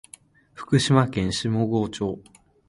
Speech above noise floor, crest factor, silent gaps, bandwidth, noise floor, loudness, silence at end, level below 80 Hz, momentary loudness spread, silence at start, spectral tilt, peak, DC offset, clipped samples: 29 dB; 22 dB; none; 11.5 kHz; -51 dBFS; -23 LUFS; 0.5 s; -50 dBFS; 13 LU; 0.55 s; -5.5 dB/octave; -4 dBFS; under 0.1%; under 0.1%